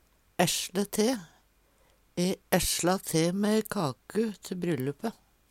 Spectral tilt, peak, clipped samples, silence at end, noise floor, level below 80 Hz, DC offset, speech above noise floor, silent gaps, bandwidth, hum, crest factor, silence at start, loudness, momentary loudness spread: -4 dB/octave; -8 dBFS; under 0.1%; 0.4 s; -65 dBFS; -52 dBFS; under 0.1%; 37 dB; none; 17.5 kHz; none; 22 dB; 0.4 s; -29 LUFS; 10 LU